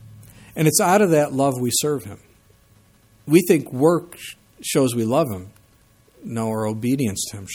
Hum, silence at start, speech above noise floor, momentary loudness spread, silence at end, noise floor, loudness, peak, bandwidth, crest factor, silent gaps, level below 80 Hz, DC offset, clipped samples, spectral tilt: none; 0.05 s; 36 dB; 20 LU; 0 s; -56 dBFS; -20 LUFS; -2 dBFS; 20 kHz; 20 dB; none; -58 dBFS; under 0.1%; under 0.1%; -5 dB/octave